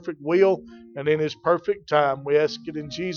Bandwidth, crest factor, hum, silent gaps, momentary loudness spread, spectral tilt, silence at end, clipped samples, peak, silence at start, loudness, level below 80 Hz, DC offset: 7 kHz; 18 dB; none; none; 11 LU; -6 dB/octave; 0 s; under 0.1%; -4 dBFS; 0.05 s; -23 LUFS; -62 dBFS; under 0.1%